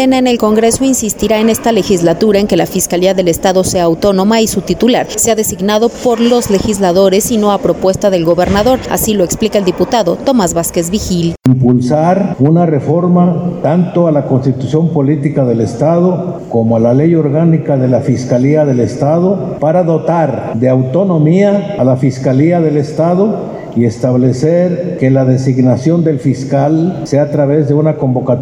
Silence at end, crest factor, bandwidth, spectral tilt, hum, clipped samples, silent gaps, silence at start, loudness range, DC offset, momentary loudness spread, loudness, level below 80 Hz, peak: 0 s; 10 dB; 19.5 kHz; -6 dB/octave; none; under 0.1%; none; 0 s; 1 LU; under 0.1%; 4 LU; -11 LUFS; -38 dBFS; 0 dBFS